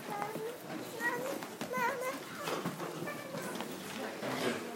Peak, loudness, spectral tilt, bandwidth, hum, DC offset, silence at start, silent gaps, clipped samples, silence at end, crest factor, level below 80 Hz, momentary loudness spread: -20 dBFS; -38 LUFS; -4 dB/octave; 16 kHz; none; under 0.1%; 0 s; none; under 0.1%; 0 s; 18 dB; -82 dBFS; 6 LU